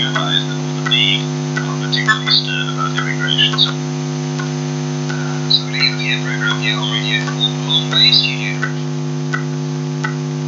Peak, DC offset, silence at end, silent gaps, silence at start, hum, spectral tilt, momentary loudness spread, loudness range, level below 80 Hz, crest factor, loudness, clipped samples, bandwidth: 0 dBFS; under 0.1%; 0 s; none; 0 s; none; -4 dB/octave; 9 LU; 3 LU; -60 dBFS; 16 dB; -16 LUFS; under 0.1%; 7.6 kHz